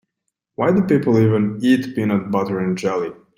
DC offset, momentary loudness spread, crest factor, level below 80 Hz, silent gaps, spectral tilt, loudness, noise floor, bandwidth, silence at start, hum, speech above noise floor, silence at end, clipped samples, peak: under 0.1%; 6 LU; 14 dB; -56 dBFS; none; -8 dB/octave; -18 LUFS; -77 dBFS; 15.5 kHz; 0.6 s; none; 60 dB; 0.25 s; under 0.1%; -4 dBFS